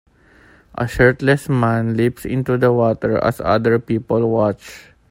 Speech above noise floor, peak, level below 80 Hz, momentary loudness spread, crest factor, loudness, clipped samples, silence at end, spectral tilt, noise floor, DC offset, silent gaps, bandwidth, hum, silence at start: 33 dB; 0 dBFS; -42 dBFS; 9 LU; 16 dB; -17 LUFS; under 0.1%; 0.3 s; -7.5 dB/octave; -49 dBFS; under 0.1%; none; 16 kHz; none; 0.75 s